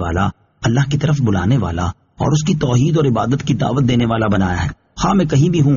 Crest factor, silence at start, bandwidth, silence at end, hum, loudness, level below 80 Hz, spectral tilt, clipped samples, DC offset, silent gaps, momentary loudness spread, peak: 12 dB; 0 s; 7.4 kHz; 0 s; none; -16 LUFS; -36 dBFS; -7 dB/octave; under 0.1%; under 0.1%; none; 8 LU; -4 dBFS